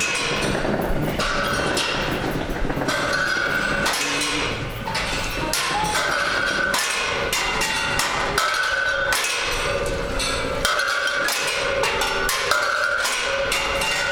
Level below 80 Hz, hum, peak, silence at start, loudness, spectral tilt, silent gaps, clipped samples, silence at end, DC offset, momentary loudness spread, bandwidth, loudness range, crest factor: -36 dBFS; none; -6 dBFS; 0 s; -21 LUFS; -2.5 dB/octave; none; under 0.1%; 0 s; under 0.1%; 4 LU; over 20 kHz; 2 LU; 16 dB